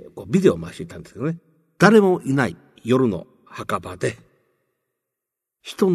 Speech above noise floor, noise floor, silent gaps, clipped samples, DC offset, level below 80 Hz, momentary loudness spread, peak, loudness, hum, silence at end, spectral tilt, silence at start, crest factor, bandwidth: 65 dB; -84 dBFS; none; under 0.1%; under 0.1%; -56 dBFS; 21 LU; -2 dBFS; -20 LUFS; none; 0 s; -6.5 dB/octave; 0.15 s; 20 dB; 13.5 kHz